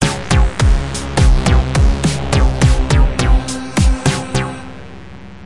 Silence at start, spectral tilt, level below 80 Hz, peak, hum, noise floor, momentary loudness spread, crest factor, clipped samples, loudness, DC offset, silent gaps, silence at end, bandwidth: 0 s; -5.5 dB/octave; -16 dBFS; 0 dBFS; none; -34 dBFS; 17 LU; 12 dB; under 0.1%; -15 LUFS; 1%; none; 0 s; 11.5 kHz